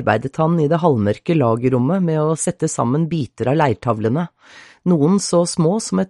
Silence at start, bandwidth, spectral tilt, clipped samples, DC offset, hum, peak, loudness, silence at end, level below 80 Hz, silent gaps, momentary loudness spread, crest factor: 0 s; 11.5 kHz; -6.5 dB/octave; under 0.1%; under 0.1%; none; -2 dBFS; -18 LUFS; 0 s; -54 dBFS; none; 5 LU; 16 dB